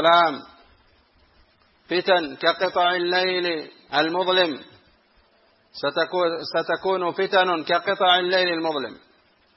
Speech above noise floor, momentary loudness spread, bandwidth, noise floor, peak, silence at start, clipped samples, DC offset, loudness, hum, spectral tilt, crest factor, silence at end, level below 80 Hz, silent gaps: 39 dB; 9 LU; 7 kHz; -60 dBFS; -4 dBFS; 0 s; under 0.1%; under 0.1%; -22 LUFS; none; -5.5 dB/octave; 18 dB; 0.6 s; -68 dBFS; none